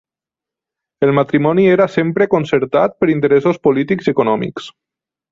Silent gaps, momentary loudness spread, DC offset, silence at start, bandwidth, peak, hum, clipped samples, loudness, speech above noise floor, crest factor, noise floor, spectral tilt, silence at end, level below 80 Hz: none; 6 LU; under 0.1%; 1 s; 7.4 kHz; -2 dBFS; none; under 0.1%; -14 LUFS; 74 dB; 14 dB; -88 dBFS; -8 dB/octave; 0.6 s; -54 dBFS